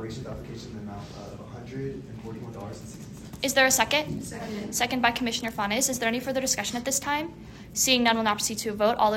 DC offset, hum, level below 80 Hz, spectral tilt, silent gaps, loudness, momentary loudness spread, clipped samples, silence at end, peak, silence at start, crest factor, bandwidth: under 0.1%; none; -52 dBFS; -2.5 dB/octave; none; -25 LUFS; 19 LU; under 0.1%; 0 s; -6 dBFS; 0 s; 22 dB; 16.5 kHz